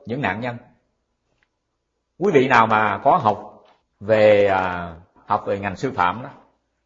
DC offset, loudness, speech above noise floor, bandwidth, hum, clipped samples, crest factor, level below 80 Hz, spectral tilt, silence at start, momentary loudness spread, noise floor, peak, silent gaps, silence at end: under 0.1%; -19 LUFS; 56 dB; 7.6 kHz; none; under 0.1%; 20 dB; -56 dBFS; -6.5 dB/octave; 0.05 s; 17 LU; -75 dBFS; 0 dBFS; none; 0.5 s